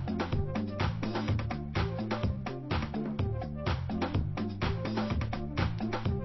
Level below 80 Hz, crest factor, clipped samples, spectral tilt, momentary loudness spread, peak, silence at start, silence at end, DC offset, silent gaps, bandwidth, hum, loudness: -40 dBFS; 16 dB; under 0.1%; -7.5 dB/octave; 2 LU; -16 dBFS; 0 s; 0 s; under 0.1%; none; 6 kHz; none; -34 LUFS